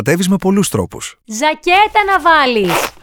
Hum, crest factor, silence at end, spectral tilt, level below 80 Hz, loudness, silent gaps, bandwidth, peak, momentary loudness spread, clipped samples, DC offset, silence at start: none; 14 dB; 0.1 s; -4 dB/octave; -42 dBFS; -12 LUFS; none; 19.5 kHz; 0 dBFS; 11 LU; under 0.1%; under 0.1%; 0 s